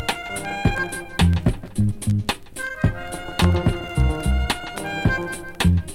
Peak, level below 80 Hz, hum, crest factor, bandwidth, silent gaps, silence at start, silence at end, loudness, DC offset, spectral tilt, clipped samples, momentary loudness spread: -4 dBFS; -28 dBFS; none; 18 dB; 16 kHz; none; 0 s; 0 s; -23 LUFS; under 0.1%; -5.5 dB/octave; under 0.1%; 9 LU